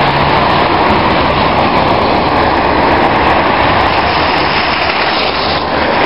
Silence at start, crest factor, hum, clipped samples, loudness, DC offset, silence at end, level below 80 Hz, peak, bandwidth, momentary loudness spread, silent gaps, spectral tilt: 0 s; 10 dB; none; under 0.1%; -10 LUFS; 2%; 0 s; -28 dBFS; 0 dBFS; 10.5 kHz; 2 LU; none; -7 dB/octave